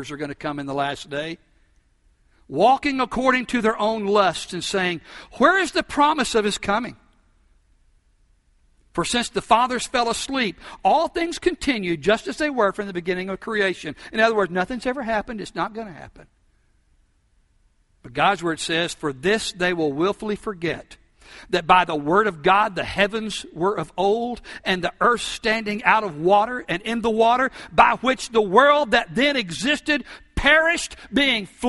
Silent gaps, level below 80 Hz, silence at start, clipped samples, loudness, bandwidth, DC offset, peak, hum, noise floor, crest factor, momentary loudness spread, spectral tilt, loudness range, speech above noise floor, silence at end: none; -48 dBFS; 0 s; under 0.1%; -21 LUFS; 11.5 kHz; under 0.1%; 0 dBFS; none; -62 dBFS; 22 dB; 11 LU; -4 dB/octave; 7 LU; 41 dB; 0 s